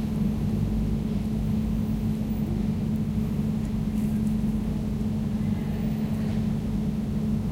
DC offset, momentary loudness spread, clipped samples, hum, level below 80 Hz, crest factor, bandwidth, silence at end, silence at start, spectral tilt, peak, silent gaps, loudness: under 0.1%; 2 LU; under 0.1%; 50 Hz at -35 dBFS; -36 dBFS; 12 dB; 16 kHz; 0 s; 0 s; -8.5 dB/octave; -14 dBFS; none; -27 LUFS